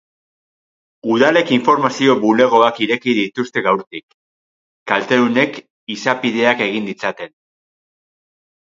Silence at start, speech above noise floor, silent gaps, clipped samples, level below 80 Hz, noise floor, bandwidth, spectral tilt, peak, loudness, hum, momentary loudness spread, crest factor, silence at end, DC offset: 1.05 s; over 74 dB; 3.87-3.91 s, 4.03-4.08 s, 4.14-4.86 s, 5.70-5.87 s; under 0.1%; -64 dBFS; under -90 dBFS; 7.6 kHz; -5 dB/octave; 0 dBFS; -16 LUFS; none; 16 LU; 18 dB; 1.35 s; under 0.1%